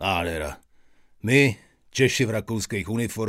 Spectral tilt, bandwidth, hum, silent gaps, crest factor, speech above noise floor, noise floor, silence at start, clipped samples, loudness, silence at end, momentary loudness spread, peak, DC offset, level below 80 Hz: -5 dB/octave; 16 kHz; none; none; 20 dB; 31 dB; -55 dBFS; 0 s; under 0.1%; -24 LUFS; 0 s; 14 LU; -4 dBFS; under 0.1%; -48 dBFS